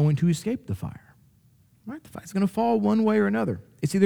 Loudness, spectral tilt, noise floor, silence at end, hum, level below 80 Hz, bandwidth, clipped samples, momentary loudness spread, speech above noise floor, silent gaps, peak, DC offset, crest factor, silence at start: -25 LUFS; -7.5 dB/octave; -60 dBFS; 0 s; none; -58 dBFS; 18 kHz; under 0.1%; 18 LU; 36 dB; none; -8 dBFS; under 0.1%; 18 dB; 0 s